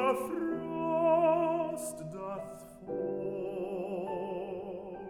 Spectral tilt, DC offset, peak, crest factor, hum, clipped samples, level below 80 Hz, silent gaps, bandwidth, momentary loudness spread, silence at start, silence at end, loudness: -6 dB/octave; under 0.1%; -16 dBFS; 18 dB; none; under 0.1%; -66 dBFS; none; 17.5 kHz; 14 LU; 0 s; 0 s; -33 LUFS